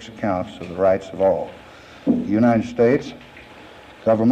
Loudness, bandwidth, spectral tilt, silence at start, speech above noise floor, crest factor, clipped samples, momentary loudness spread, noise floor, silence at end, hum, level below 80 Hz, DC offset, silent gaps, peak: -20 LUFS; 8.6 kHz; -8 dB/octave; 0 s; 23 dB; 14 dB; under 0.1%; 21 LU; -43 dBFS; 0 s; none; -52 dBFS; under 0.1%; none; -8 dBFS